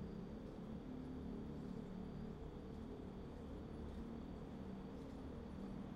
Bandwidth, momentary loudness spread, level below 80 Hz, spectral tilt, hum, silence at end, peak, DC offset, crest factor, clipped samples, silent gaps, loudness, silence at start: 13.5 kHz; 3 LU; -58 dBFS; -8.5 dB/octave; none; 0 s; -38 dBFS; under 0.1%; 12 dB; under 0.1%; none; -52 LUFS; 0 s